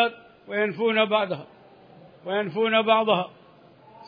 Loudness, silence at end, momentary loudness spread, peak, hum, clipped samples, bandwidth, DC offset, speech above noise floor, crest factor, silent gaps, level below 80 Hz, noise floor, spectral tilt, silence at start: -24 LUFS; 0 s; 13 LU; -6 dBFS; none; under 0.1%; 5.2 kHz; under 0.1%; 29 dB; 20 dB; none; -76 dBFS; -53 dBFS; -8 dB/octave; 0 s